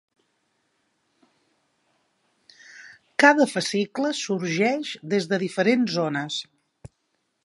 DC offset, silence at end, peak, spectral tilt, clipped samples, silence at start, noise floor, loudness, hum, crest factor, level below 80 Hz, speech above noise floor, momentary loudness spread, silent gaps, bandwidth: under 0.1%; 0.55 s; -2 dBFS; -4.5 dB/octave; under 0.1%; 2.75 s; -74 dBFS; -23 LUFS; none; 24 dB; -70 dBFS; 51 dB; 14 LU; none; 11.5 kHz